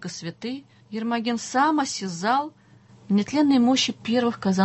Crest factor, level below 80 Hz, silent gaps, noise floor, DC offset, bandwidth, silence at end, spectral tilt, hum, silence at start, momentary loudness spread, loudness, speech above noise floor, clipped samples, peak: 14 dB; -64 dBFS; none; -51 dBFS; under 0.1%; 8.4 kHz; 0 s; -4.5 dB/octave; none; 0 s; 15 LU; -23 LUFS; 28 dB; under 0.1%; -10 dBFS